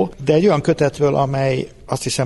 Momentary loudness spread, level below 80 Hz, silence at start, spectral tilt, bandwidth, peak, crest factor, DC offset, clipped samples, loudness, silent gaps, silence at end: 10 LU; -44 dBFS; 0 s; -6 dB/octave; 11.5 kHz; -4 dBFS; 14 dB; under 0.1%; under 0.1%; -18 LUFS; none; 0 s